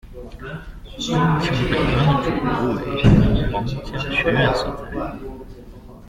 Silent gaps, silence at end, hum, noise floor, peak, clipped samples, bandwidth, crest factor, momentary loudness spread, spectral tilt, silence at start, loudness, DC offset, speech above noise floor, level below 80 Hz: none; 0 s; none; -39 dBFS; -2 dBFS; under 0.1%; 12 kHz; 18 dB; 20 LU; -7 dB/octave; 0.05 s; -20 LUFS; under 0.1%; 20 dB; -30 dBFS